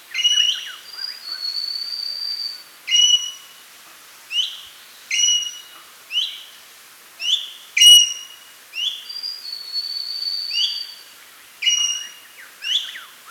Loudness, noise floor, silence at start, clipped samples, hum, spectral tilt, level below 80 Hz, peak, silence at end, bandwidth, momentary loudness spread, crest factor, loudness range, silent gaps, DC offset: -18 LUFS; -45 dBFS; 0.1 s; under 0.1%; none; 6 dB/octave; -78 dBFS; 0 dBFS; 0 s; over 20 kHz; 19 LU; 22 dB; 7 LU; none; under 0.1%